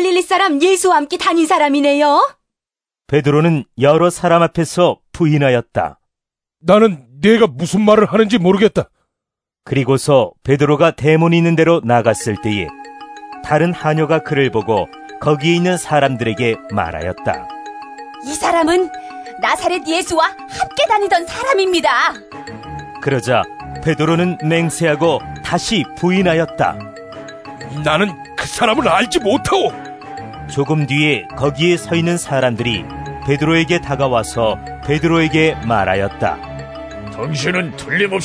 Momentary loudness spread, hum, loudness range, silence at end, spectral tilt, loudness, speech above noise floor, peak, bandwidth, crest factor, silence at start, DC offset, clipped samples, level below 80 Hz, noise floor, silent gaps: 17 LU; none; 4 LU; 0 s; -5.5 dB/octave; -15 LUFS; 75 dB; 0 dBFS; 11 kHz; 16 dB; 0 s; under 0.1%; under 0.1%; -42 dBFS; -90 dBFS; none